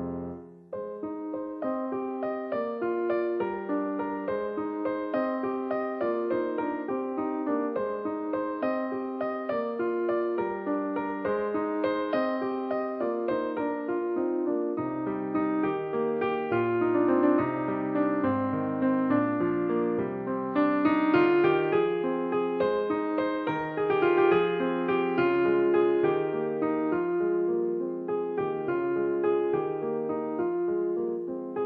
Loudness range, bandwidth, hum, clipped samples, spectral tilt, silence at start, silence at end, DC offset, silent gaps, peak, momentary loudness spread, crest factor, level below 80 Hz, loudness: 5 LU; 5.2 kHz; none; under 0.1%; -9.5 dB/octave; 0 s; 0 s; under 0.1%; none; -12 dBFS; 8 LU; 16 dB; -66 dBFS; -28 LUFS